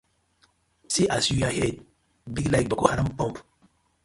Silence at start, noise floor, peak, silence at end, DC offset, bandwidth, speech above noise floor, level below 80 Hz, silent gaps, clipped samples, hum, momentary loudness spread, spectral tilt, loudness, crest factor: 0.9 s; -65 dBFS; -2 dBFS; 0.65 s; under 0.1%; 11.5 kHz; 41 dB; -46 dBFS; none; under 0.1%; none; 11 LU; -4.5 dB/octave; -25 LUFS; 26 dB